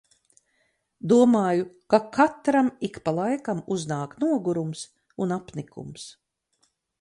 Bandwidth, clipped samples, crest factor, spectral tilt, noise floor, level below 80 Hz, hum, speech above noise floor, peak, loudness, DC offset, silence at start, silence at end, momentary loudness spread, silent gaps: 11 kHz; under 0.1%; 20 dB; -6.5 dB/octave; -71 dBFS; -66 dBFS; none; 47 dB; -6 dBFS; -24 LUFS; under 0.1%; 1.05 s; 0.9 s; 19 LU; none